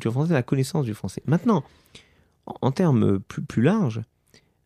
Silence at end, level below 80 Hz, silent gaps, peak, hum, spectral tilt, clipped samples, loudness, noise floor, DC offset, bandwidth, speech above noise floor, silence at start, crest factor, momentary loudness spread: 0.6 s; -58 dBFS; none; -6 dBFS; none; -7.5 dB/octave; under 0.1%; -23 LUFS; -59 dBFS; under 0.1%; 14.5 kHz; 37 dB; 0 s; 18 dB; 10 LU